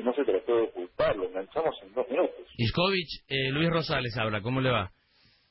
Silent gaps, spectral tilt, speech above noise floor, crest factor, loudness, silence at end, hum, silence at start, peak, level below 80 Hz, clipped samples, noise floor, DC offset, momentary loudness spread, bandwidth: none; -10 dB/octave; 36 dB; 16 dB; -29 LUFS; 0.65 s; none; 0 s; -12 dBFS; -52 dBFS; under 0.1%; -65 dBFS; under 0.1%; 6 LU; 5.8 kHz